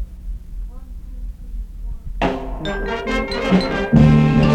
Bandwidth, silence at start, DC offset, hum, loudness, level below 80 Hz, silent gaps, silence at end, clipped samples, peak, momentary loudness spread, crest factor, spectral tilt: 8.6 kHz; 0 s; under 0.1%; none; -17 LUFS; -28 dBFS; none; 0 s; under 0.1%; -2 dBFS; 23 LU; 16 dB; -7.5 dB/octave